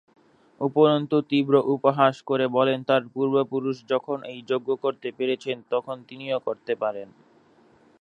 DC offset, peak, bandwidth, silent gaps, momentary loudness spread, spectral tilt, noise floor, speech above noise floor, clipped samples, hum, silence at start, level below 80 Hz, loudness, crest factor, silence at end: under 0.1%; -4 dBFS; 7.8 kHz; none; 10 LU; -7.5 dB/octave; -58 dBFS; 34 dB; under 0.1%; none; 0.6 s; -78 dBFS; -24 LUFS; 20 dB; 0.95 s